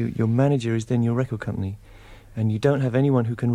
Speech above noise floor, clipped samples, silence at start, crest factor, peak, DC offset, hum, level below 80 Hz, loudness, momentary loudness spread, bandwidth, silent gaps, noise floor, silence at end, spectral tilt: 23 dB; under 0.1%; 0 s; 16 dB; -8 dBFS; under 0.1%; none; -50 dBFS; -23 LUFS; 10 LU; 10.5 kHz; none; -45 dBFS; 0 s; -8.5 dB/octave